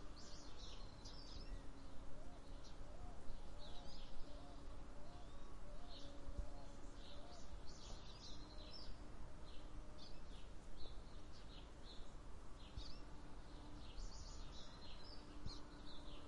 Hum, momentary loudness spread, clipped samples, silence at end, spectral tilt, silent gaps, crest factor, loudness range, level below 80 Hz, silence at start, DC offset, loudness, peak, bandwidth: none; 4 LU; under 0.1%; 0 s; -4.5 dB/octave; none; 16 dB; 2 LU; -56 dBFS; 0 s; under 0.1%; -58 LUFS; -32 dBFS; 11 kHz